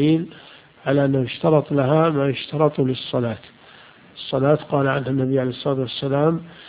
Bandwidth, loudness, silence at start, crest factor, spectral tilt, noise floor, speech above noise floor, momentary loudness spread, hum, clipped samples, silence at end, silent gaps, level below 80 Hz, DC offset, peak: 5 kHz; -21 LUFS; 0 s; 18 dB; -12 dB/octave; -47 dBFS; 27 dB; 8 LU; none; under 0.1%; 0 s; none; -56 dBFS; under 0.1%; -2 dBFS